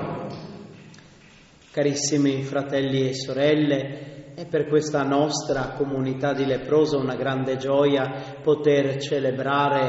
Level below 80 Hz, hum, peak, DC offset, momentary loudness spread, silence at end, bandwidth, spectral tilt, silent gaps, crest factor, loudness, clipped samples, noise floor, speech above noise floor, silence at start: -56 dBFS; none; -8 dBFS; under 0.1%; 13 LU; 0 s; 8 kHz; -5 dB/octave; none; 16 dB; -23 LUFS; under 0.1%; -51 dBFS; 29 dB; 0 s